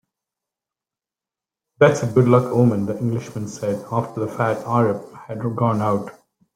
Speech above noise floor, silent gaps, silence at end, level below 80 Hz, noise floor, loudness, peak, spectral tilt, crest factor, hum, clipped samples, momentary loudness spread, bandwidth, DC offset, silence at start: 70 dB; none; 0.45 s; -58 dBFS; -89 dBFS; -20 LUFS; -2 dBFS; -7.5 dB/octave; 20 dB; none; under 0.1%; 12 LU; 14.5 kHz; under 0.1%; 1.8 s